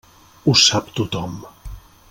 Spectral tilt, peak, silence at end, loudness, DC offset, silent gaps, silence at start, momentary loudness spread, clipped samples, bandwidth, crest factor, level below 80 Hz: -3 dB/octave; 0 dBFS; 0.3 s; -17 LUFS; under 0.1%; none; 0.45 s; 22 LU; under 0.1%; 17 kHz; 20 dB; -42 dBFS